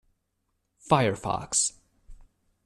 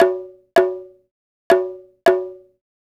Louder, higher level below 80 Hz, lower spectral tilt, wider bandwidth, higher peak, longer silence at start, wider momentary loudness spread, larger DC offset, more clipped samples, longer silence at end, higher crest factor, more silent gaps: second, -26 LUFS vs -20 LUFS; first, -54 dBFS vs -60 dBFS; about the same, -3.5 dB/octave vs -4.5 dB/octave; second, 13 kHz vs 14.5 kHz; second, -6 dBFS vs -2 dBFS; first, 0.85 s vs 0 s; second, 6 LU vs 13 LU; neither; neither; second, 0.5 s vs 0.65 s; about the same, 24 dB vs 20 dB; second, none vs 1.11-1.50 s